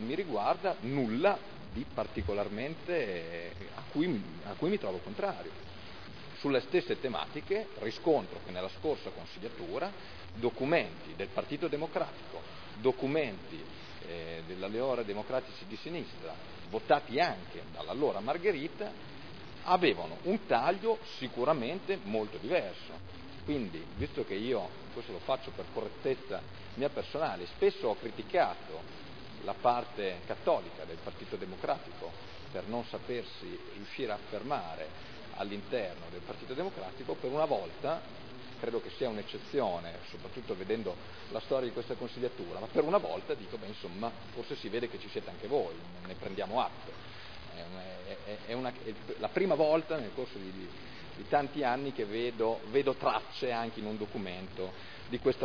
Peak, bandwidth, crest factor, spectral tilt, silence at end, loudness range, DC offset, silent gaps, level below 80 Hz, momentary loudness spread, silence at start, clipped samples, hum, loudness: -12 dBFS; 5.4 kHz; 22 dB; -4 dB/octave; 0 s; 6 LU; 0.4%; none; -62 dBFS; 15 LU; 0 s; under 0.1%; none; -35 LUFS